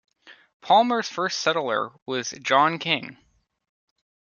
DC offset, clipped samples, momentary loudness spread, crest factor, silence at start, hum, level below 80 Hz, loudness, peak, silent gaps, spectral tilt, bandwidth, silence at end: under 0.1%; under 0.1%; 10 LU; 22 dB; 0.25 s; none; -74 dBFS; -23 LUFS; -4 dBFS; 0.54-0.60 s, 2.02-2.06 s; -3 dB/octave; 7.2 kHz; 1.25 s